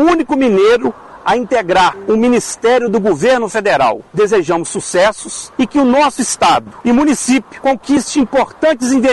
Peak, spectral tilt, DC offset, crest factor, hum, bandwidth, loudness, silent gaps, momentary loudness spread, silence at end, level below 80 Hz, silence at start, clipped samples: -2 dBFS; -4 dB/octave; under 0.1%; 10 dB; none; 12 kHz; -13 LUFS; none; 6 LU; 0 s; -44 dBFS; 0 s; under 0.1%